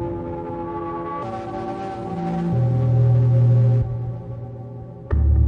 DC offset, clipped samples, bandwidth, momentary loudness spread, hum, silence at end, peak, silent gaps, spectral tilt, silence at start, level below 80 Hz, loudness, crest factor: under 0.1%; under 0.1%; 3.7 kHz; 17 LU; none; 0 s; -8 dBFS; none; -10.5 dB/octave; 0 s; -30 dBFS; -22 LUFS; 12 dB